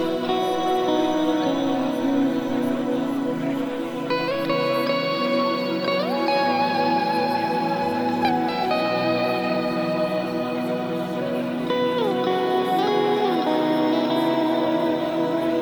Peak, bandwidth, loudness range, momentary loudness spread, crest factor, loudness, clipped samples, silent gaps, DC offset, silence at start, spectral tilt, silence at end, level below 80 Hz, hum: -10 dBFS; 19 kHz; 2 LU; 5 LU; 12 dB; -23 LUFS; under 0.1%; none; under 0.1%; 0 s; -6 dB/octave; 0 s; -60 dBFS; none